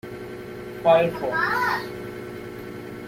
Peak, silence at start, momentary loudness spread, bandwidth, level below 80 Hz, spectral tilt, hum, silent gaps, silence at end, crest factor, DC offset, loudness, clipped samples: -6 dBFS; 0.05 s; 17 LU; 16.5 kHz; -56 dBFS; -5.5 dB/octave; none; none; 0 s; 18 dB; under 0.1%; -22 LUFS; under 0.1%